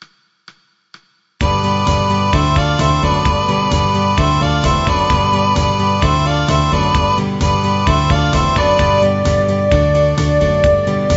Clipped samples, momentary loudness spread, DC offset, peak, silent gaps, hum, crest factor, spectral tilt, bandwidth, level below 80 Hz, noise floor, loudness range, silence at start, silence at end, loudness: under 0.1%; 2 LU; 0.1%; 0 dBFS; none; none; 14 dB; -6 dB/octave; 8 kHz; -24 dBFS; -47 dBFS; 2 LU; 1.4 s; 0 s; -14 LUFS